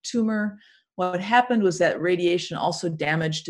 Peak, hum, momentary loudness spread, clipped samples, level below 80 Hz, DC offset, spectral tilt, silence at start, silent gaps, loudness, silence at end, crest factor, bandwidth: -6 dBFS; none; 8 LU; under 0.1%; -66 dBFS; under 0.1%; -5 dB/octave; 0.05 s; none; -23 LUFS; 0 s; 18 dB; 11 kHz